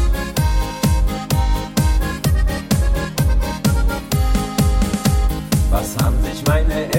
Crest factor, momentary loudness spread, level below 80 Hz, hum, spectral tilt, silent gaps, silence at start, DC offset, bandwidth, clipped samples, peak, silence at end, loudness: 14 dB; 2 LU; -18 dBFS; none; -5.5 dB/octave; none; 0 s; under 0.1%; 17 kHz; under 0.1%; -2 dBFS; 0 s; -19 LUFS